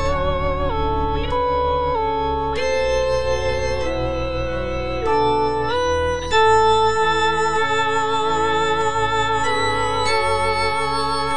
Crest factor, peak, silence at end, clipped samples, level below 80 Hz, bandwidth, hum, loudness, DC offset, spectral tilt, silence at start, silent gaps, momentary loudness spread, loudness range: 14 dB; -6 dBFS; 0 s; under 0.1%; -32 dBFS; 10.5 kHz; none; -19 LUFS; 4%; -4.5 dB/octave; 0 s; none; 6 LU; 4 LU